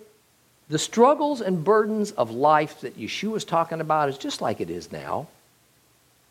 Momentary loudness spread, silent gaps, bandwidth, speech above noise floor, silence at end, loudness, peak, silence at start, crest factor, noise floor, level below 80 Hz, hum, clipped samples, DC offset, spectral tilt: 13 LU; none; 16 kHz; 38 dB; 1.05 s; -24 LUFS; -4 dBFS; 0.7 s; 20 dB; -61 dBFS; -68 dBFS; none; under 0.1%; under 0.1%; -5 dB/octave